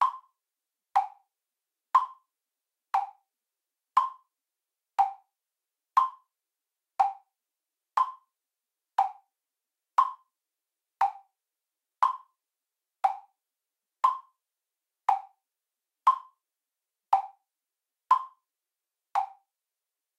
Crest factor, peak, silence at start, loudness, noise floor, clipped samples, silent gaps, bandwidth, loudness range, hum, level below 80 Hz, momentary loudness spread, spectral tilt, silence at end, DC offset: 24 dB; -10 dBFS; 0 s; -29 LUFS; -90 dBFS; under 0.1%; none; 13 kHz; 2 LU; none; under -90 dBFS; 13 LU; 1 dB/octave; 0.9 s; under 0.1%